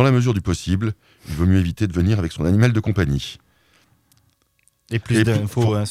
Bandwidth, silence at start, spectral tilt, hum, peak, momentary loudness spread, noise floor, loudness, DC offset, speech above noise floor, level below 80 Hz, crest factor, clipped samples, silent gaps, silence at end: 14.5 kHz; 0 s; -7 dB/octave; none; -2 dBFS; 10 LU; -63 dBFS; -20 LUFS; under 0.1%; 44 dB; -38 dBFS; 18 dB; under 0.1%; none; 0 s